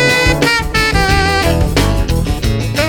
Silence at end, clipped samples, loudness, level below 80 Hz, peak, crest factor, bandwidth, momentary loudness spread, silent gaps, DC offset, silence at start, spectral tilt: 0 s; under 0.1%; -13 LUFS; -20 dBFS; 0 dBFS; 12 dB; 19 kHz; 5 LU; none; under 0.1%; 0 s; -4.5 dB/octave